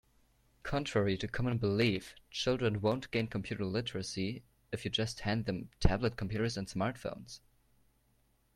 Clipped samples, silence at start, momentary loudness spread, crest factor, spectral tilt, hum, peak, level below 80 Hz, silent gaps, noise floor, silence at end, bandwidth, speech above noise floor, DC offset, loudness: under 0.1%; 0.65 s; 11 LU; 26 dB; -5.5 dB/octave; none; -10 dBFS; -48 dBFS; none; -72 dBFS; 1.2 s; 13.5 kHz; 38 dB; under 0.1%; -35 LUFS